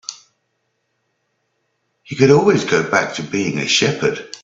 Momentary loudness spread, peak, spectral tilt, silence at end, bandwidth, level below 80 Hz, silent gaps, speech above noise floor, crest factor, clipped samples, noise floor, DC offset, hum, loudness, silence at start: 9 LU; 0 dBFS; -4.5 dB/octave; 0.05 s; 7.8 kHz; -58 dBFS; none; 54 dB; 18 dB; under 0.1%; -70 dBFS; under 0.1%; none; -16 LUFS; 0.1 s